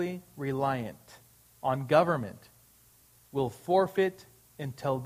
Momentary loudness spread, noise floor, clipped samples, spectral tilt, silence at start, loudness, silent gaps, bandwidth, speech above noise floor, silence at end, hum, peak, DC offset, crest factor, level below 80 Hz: 15 LU; -61 dBFS; under 0.1%; -7 dB/octave; 0 s; -30 LUFS; none; 15.5 kHz; 32 dB; 0 s; none; -10 dBFS; under 0.1%; 22 dB; -66 dBFS